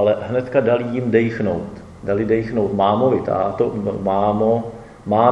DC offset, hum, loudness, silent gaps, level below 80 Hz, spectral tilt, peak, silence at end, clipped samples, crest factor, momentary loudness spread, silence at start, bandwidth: under 0.1%; none; -19 LUFS; none; -48 dBFS; -8.5 dB/octave; 0 dBFS; 0 s; under 0.1%; 18 dB; 7 LU; 0 s; 8.8 kHz